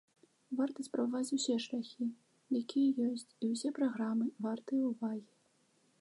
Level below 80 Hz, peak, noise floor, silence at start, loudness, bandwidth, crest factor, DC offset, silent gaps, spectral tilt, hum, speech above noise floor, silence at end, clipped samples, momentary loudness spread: under -90 dBFS; -22 dBFS; -73 dBFS; 0.5 s; -36 LUFS; 11.5 kHz; 14 dB; under 0.1%; none; -4.5 dB/octave; none; 37 dB; 0.75 s; under 0.1%; 9 LU